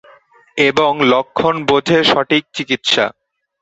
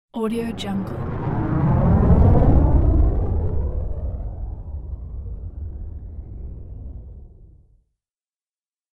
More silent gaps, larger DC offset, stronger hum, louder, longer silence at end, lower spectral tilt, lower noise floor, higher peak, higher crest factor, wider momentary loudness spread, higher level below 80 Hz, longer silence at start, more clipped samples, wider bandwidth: neither; neither; neither; first, -14 LUFS vs -20 LUFS; second, 0.5 s vs 1.45 s; second, -4 dB/octave vs -9.5 dB/octave; second, -48 dBFS vs under -90 dBFS; first, 0 dBFS vs -4 dBFS; about the same, 16 dB vs 18 dB; second, 6 LU vs 21 LU; second, -54 dBFS vs -24 dBFS; first, 0.55 s vs 0.15 s; neither; second, 8.2 kHz vs 11.5 kHz